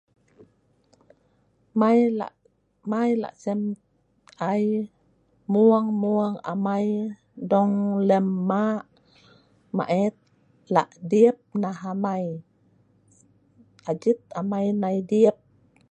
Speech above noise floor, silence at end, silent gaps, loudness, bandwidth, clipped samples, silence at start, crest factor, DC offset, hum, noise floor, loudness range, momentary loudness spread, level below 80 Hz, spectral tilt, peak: 42 dB; 0.55 s; none; -24 LUFS; 8.4 kHz; under 0.1%; 1.75 s; 20 dB; under 0.1%; none; -65 dBFS; 5 LU; 13 LU; -72 dBFS; -8.5 dB/octave; -4 dBFS